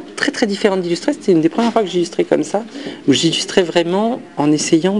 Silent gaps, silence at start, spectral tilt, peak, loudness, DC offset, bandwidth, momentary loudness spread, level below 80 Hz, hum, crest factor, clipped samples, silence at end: none; 0 s; -4.5 dB/octave; 0 dBFS; -16 LUFS; 0.2%; 11.5 kHz; 6 LU; -58 dBFS; none; 16 dB; under 0.1%; 0 s